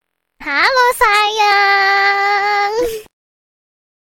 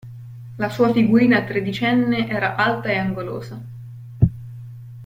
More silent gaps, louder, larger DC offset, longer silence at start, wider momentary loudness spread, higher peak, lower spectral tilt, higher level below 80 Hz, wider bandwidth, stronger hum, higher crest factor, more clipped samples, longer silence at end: neither; first, -12 LUFS vs -19 LUFS; neither; first, 0.4 s vs 0.05 s; second, 9 LU vs 22 LU; about the same, 0 dBFS vs -2 dBFS; second, -0.5 dB/octave vs -7.5 dB/octave; about the same, -46 dBFS vs -44 dBFS; about the same, 17 kHz vs 16 kHz; neither; about the same, 14 dB vs 18 dB; neither; first, 1.05 s vs 0 s